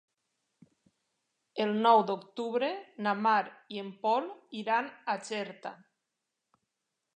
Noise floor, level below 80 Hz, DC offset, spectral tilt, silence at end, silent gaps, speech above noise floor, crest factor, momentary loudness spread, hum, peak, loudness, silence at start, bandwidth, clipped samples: -86 dBFS; -90 dBFS; under 0.1%; -5 dB/octave; 1.4 s; none; 55 dB; 22 dB; 17 LU; none; -10 dBFS; -31 LUFS; 1.55 s; 9.6 kHz; under 0.1%